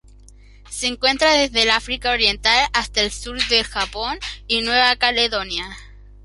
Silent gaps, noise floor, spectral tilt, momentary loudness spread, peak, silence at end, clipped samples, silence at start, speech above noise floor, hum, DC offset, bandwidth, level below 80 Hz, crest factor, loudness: none; -45 dBFS; -1.5 dB/octave; 11 LU; 0 dBFS; 0.1 s; under 0.1%; 0.65 s; 25 dB; none; under 0.1%; 11.5 kHz; -40 dBFS; 20 dB; -18 LUFS